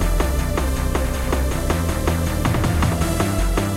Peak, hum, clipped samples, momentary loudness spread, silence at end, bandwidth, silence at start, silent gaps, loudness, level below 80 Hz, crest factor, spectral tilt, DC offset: -4 dBFS; none; under 0.1%; 3 LU; 0 s; 16 kHz; 0 s; none; -21 LUFS; -22 dBFS; 14 dB; -5.5 dB/octave; under 0.1%